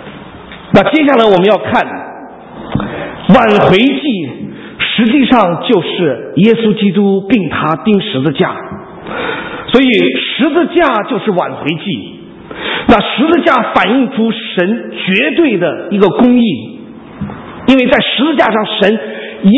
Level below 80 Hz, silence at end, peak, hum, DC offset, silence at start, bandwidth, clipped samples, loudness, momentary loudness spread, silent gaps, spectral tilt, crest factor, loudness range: -42 dBFS; 0 s; 0 dBFS; none; under 0.1%; 0 s; 8 kHz; 0.4%; -11 LUFS; 17 LU; none; -7.5 dB/octave; 12 dB; 2 LU